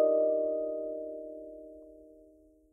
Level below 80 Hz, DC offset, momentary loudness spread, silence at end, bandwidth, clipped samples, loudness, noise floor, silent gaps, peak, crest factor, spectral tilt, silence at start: -70 dBFS; under 0.1%; 23 LU; 0.6 s; 1.4 kHz; under 0.1%; -32 LUFS; -61 dBFS; none; -16 dBFS; 16 dB; -10 dB/octave; 0 s